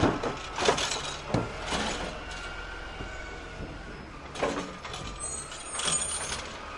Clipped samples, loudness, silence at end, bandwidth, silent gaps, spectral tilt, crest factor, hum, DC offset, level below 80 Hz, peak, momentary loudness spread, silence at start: under 0.1%; -32 LUFS; 0 s; 11.5 kHz; none; -3 dB/octave; 22 dB; none; under 0.1%; -46 dBFS; -10 dBFS; 14 LU; 0 s